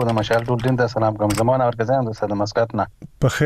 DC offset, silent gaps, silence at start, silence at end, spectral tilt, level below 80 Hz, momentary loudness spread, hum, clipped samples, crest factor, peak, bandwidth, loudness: under 0.1%; none; 0 s; 0 s; -6.5 dB/octave; -44 dBFS; 5 LU; none; under 0.1%; 12 dB; -6 dBFS; 15.5 kHz; -20 LUFS